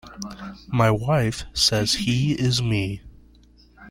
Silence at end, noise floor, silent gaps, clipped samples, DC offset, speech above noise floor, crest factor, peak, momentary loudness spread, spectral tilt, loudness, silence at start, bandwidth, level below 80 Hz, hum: 0 s; -53 dBFS; none; under 0.1%; under 0.1%; 30 dB; 18 dB; -4 dBFS; 16 LU; -4.5 dB/octave; -22 LUFS; 0.05 s; 16 kHz; -44 dBFS; none